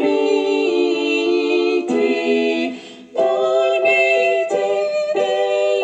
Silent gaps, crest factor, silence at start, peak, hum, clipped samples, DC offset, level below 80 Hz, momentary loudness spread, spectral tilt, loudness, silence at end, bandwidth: none; 12 dB; 0 s; -4 dBFS; none; under 0.1%; under 0.1%; -72 dBFS; 5 LU; -3.5 dB/octave; -17 LUFS; 0 s; 8.8 kHz